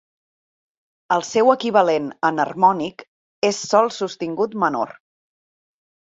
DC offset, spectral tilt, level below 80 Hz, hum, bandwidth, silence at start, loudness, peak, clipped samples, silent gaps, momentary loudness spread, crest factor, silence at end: under 0.1%; -4 dB/octave; -68 dBFS; none; 8 kHz; 1.1 s; -20 LUFS; -2 dBFS; under 0.1%; 3.08-3.42 s; 9 LU; 20 dB; 1.2 s